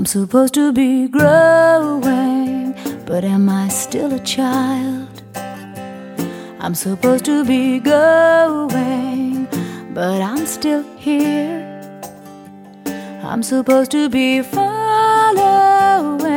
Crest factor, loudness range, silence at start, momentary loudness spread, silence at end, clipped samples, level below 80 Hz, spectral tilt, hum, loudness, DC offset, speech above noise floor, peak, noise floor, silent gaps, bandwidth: 14 dB; 7 LU; 0 s; 17 LU; 0 s; under 0.1%; -58 dBFS; -5 dB/octave; none; -15 LUFS; under 0.1%; 23 dB; 0 dBFS; -38 dBFS; none; 17.5 kHz